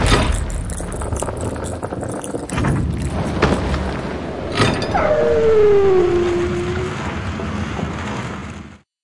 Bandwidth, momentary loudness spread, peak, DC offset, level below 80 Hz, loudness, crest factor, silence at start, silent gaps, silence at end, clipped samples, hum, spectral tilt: 11.5 kHz; 12 LU; 0 dBFS; under 0.1%; -28 dBFS; -19 LUFS; 18 dB; 0 s; none; 0 s; under 0.1%; none; -5.5 dB/octave